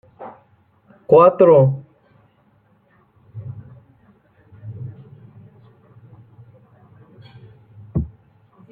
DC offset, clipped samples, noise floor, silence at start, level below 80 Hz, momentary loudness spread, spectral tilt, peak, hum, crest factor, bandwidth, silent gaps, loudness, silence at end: under 0.1%; under 0.1%; -58 dBFS; 0.2 s; -48 dBFS; 28 LU; -12.5 dB/octave; -2 dBFS; none; 20 dB; 4.4 kHz; none; -15 LUFS; 0.65 s